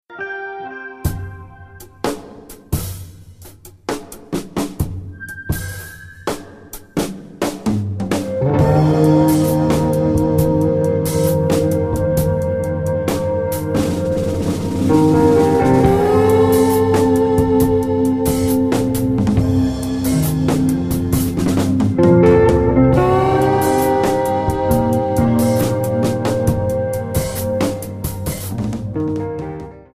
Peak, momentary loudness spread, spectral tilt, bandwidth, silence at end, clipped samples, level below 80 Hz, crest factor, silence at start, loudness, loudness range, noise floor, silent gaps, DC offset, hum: 0 dBFS; 14 LU; -7 dB/octave; 15.5 kHz; 0.15 s; under 0.1%; -34 dBFS; 16 dB; 0.1 s; -17 LUFS; 13 LU; -40 dBFS; none; under 0.1%; none